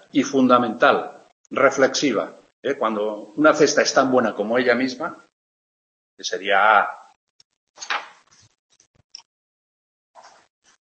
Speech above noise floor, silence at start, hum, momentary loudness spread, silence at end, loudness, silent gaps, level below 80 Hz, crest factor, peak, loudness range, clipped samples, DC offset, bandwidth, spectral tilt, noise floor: 32 dB; 0.15 s; none; 15 LU; 2.9 s; -20 LUFS; 1.32-1.44 s, 2.53-2.63 s, 5.32-6.17 s, 7.16-7.39 s, 7.45-7.50 s, 7.57-7.74 s; -72 dBFS; 20 dB; -2 dBFS; 16 LU; under 0.1%; under 0.1%; 8.4 kHz; -3.5 dB/octave; -51 dBFS